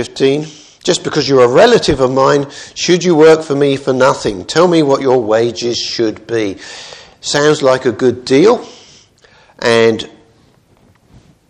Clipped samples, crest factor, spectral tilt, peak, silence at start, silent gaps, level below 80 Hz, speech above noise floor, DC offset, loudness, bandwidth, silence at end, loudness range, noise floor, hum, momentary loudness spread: 0.2%; 12 dB; -4.5 dB/octave; 0 dBFS; 0 s; none; -44 dBFS; 38 dB; under 0.1%; -12 LUFS; 10.5 kHz; 1.45 s; 4 LU; -50 dBFS; none; 13 LU